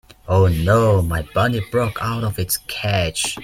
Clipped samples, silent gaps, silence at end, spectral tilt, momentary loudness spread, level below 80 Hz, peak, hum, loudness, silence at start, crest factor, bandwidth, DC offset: under 0.1%; none; 0 s; -5 dB/octave; 7 LU; -38 dBFS; -2 dBFS; none; -19 LUFS; 0.25 s; 16 dB; 16 kHz; under 0.1%